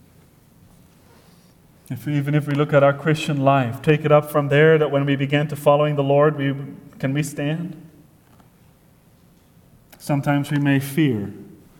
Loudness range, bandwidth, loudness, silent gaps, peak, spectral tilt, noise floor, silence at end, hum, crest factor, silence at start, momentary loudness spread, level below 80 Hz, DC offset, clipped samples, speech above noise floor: 11 LU; 17.5 kHz; -19 LUFS; none; -2 dBFS; -7 dB/octave; -54 dBFS; 0.35 s; none; 18 dB; 1.9 s; 12 LU; -58 dBFS; under 0.1%; under 0.1%; 35 dB